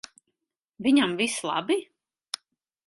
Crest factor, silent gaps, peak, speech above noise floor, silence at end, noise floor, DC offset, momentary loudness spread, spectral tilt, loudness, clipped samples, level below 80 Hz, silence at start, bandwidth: 18 dB; none; -10 dBFS; 59 dB; 1.05 s; -83 dBFS; under 0.1%; 15 LU; -3.5 dB/octave; -25 LUFS; under 0.1%; -72 dBFS; 0.8 s; 11.5 kHz